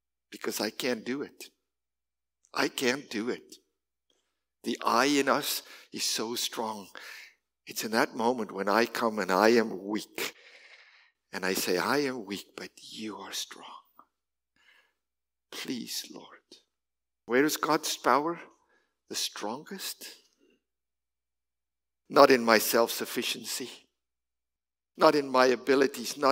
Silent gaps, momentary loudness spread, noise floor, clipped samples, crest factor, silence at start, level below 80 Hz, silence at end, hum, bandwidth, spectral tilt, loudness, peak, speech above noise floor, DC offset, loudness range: none; 19 LU; under -90 dBFS; under 0.1%; 28 dB; 0.3 s; -84 dBFS; 0 s; none; 16 kHz; -3 dB/octave; -28 LUFS; -4 dBFS; over 61 dB; under 0.1%; 12 LU